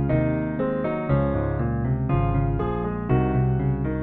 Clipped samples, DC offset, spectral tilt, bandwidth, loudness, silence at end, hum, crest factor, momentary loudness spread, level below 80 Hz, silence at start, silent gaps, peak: under 0.1%; under 0.1%; -12.5 dB/octave; 3.9 kHz; -24 LUFS; 0 s; none; 14 dB; 3 LU; -32 dBFS; 0 s; none; -8 dBFS